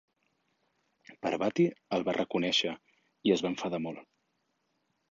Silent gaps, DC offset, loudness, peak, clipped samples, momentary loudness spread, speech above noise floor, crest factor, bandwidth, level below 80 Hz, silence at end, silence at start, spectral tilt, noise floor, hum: none; under 0.1%; -31 LUFS; -12 dBFS; under 0.1%; 10 LU; 48 dB; 22 dB; 7.6 kHz; -72 dBFS; 1.1 s; 1.1 s; -5 dB/octave; -78 dBFS; none